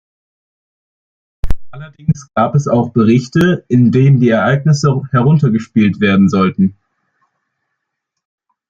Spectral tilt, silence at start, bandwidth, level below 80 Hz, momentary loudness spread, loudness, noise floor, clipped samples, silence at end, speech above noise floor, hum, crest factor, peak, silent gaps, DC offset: -7.5 dB/octave; 1.45 s; 7.6 kHz; -34 dBFS; 11 LU; -12 LUFS; -75 dBFS; under 0.1%; 2 s; 64 dB; none; 14 dB; 0 dBFS; none; under 0.1%